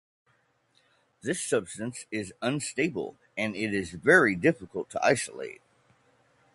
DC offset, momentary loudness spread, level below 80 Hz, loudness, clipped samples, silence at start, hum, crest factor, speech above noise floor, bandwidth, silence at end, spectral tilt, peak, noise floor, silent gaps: under 0.1%; 16 LU; -62 dBFS; -28 LUFS; under 0.1%; 1.25 s; none; 24 dB; 41 dB; 11.5 kHz; 1 s; -4.5 dB/octave; -6 dBFS; -69 dBFS; none